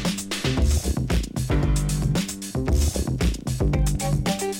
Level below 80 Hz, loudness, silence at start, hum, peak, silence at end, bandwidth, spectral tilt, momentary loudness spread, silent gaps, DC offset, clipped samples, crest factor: -26 dBFS; -24 LUFS; 0 s; none; -10 dBFS; 0 s; 17 kHz; -5 dB/octave; 3 LU; none; under 0.1%; under 0.1%; 12 dB